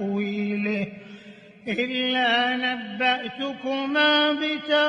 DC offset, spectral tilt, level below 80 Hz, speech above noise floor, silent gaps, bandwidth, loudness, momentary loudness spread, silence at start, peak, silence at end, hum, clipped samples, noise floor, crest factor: under 0.1%; -5.5 dB/octave; -70 dBFS; 23 dB; none; 9.6 kHz; -23 LUFS; 11 LU; 0 s; -8 dBFS; 0 s; none; under 0.1%; -46 dBFS; 16 dB